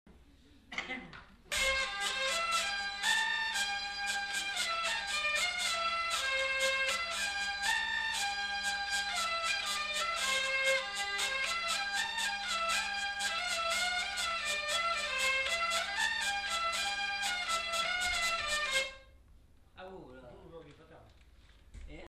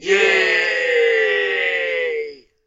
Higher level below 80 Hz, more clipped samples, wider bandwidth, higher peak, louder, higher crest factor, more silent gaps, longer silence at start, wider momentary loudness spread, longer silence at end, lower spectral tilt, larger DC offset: about the same, -60 dBFS vs -62 dBFS; neither; first, 14 kHz vs 8 kHz; second, -18 dBFS vs -2 dBFS; second, -32 LUFS vs -16 LUFS; about the same, 18 dB vs 16 dB; neither; about the same, 0.05 s vs 0 s; second, 5 LU vs 9 LU; second, 0 s vs 0.3 s; second, 0.5 dB/octave vs -1.5 dB/octave; neither